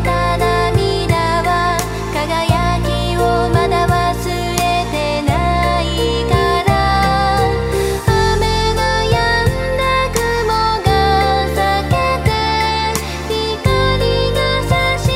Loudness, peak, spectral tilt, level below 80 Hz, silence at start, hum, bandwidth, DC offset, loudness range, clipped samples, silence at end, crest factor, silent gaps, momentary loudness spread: -15 LUFS; 0 dBFS; -5 dB/octave; -24 dBFS; 0 s; none; 16 kHz; under 0.1%; 1 LU; under 0.1%; 0 s; 14 dB; none; 4 LU